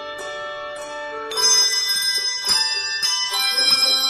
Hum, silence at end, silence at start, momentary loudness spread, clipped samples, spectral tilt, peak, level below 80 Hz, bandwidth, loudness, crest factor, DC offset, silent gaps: none; 0 s; 0 s; 16 LU; under 0.1%; 2.5 dB/octave; -6 dBFS; -60 dBFS; 16 kHz; -17 LUFS; 16 dB; under 0.1%; none